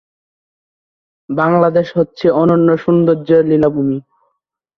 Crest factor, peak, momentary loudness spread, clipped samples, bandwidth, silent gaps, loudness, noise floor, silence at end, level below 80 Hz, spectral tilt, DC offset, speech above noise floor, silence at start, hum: 14 dB; -2 dBFS; 7 LU; under 0.1%; 6.2 kHz; none; -13 LUFS; -70 dBFS; 0.8 s; -54 dBFS; -10 dB/octave; under 0.1%; 57 dB; 1.3 s; none